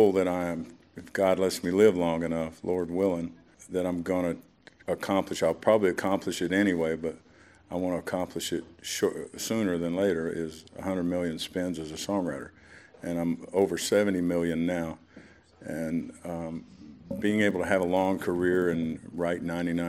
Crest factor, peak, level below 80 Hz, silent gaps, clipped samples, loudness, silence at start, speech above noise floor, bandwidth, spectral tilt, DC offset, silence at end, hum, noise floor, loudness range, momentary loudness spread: 20 dB; -8 dBFS; -60 dBFS; none; under 0.1%; -29 LUFS; 0 s; 25 dB; 16 kHz; -5.5 dB/octave; under 0.1%; 0 s; none; -53 dBFS; 4 LU; 13 LU